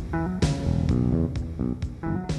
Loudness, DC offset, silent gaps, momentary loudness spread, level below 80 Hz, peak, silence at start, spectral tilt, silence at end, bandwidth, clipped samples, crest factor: -26 LUFS; under 0.1%; none; 7 LU; -34 dBFS; -10 dBFS; 0 s; -7.5 dB/octave; 0 s; 11.5 kHz; under 0.1%; 16 dB